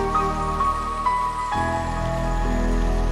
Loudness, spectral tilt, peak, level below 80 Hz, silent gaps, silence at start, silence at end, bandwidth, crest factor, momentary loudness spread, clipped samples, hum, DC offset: -24 LUFS; -6 dB/octave; -10 dBFS; -26 dBFS; none; 0 s; 0 s; 12 kHz; 12 dB; 3 LU; under 0.1%; none; under 0.1%